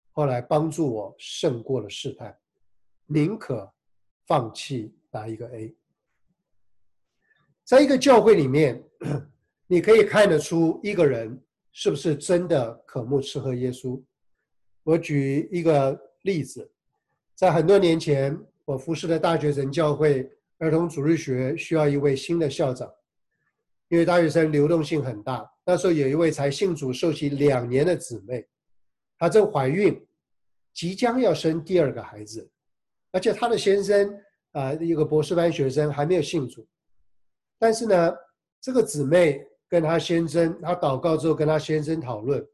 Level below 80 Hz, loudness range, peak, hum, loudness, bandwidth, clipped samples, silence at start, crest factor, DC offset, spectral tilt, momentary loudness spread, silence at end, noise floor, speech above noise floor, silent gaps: -60 dBFS; 7 LU; -6 dBFS; none; -23 LUFS; 12.5 kHz; under 0.1%; 0.15 s; 18 dB; under 0.1%; -6 dB/octave; 15 LU; 0.1 s; -84 dBFS; 61 dB; 4.11-4.20 s, 38.52-38.62 s